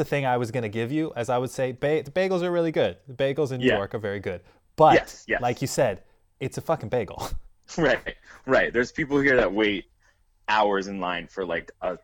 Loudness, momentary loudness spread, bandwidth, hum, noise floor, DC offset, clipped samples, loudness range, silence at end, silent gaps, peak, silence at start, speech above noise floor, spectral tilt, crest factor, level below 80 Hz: -25 LUFS; 14 LU; 19.5 kHz; none; -63 dBFS; under 0.1%; under 0.1%; 3 LU; 0.05 s; none; -4 dBFS; 0 s; 38 dB; -5.5 dB/octave; 20 dB; -48 dBFS